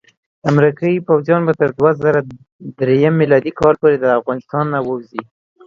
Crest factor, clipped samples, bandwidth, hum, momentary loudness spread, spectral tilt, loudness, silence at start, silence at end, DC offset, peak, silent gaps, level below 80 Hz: 16 dB; under 0.1%; 7.2 kHz; none; 12 LU; -9 dB/octave; -15 LUFS; 0.45 s; 0.45 s; under 0.1%; 0 dBFS; 2.52-2.59 s; -52 dBFS